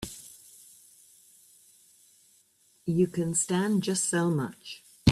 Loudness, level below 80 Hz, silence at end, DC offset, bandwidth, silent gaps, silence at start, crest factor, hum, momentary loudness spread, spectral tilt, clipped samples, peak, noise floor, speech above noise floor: -28 LUFS; -64 dBFS; 0 s; under 0.1%; 15 kHz; none; 0 s; 24 dB; none; 22 LU; -5 dB/octave; under 0.1%; -6 dBFS; -65 dBFS; 37 dB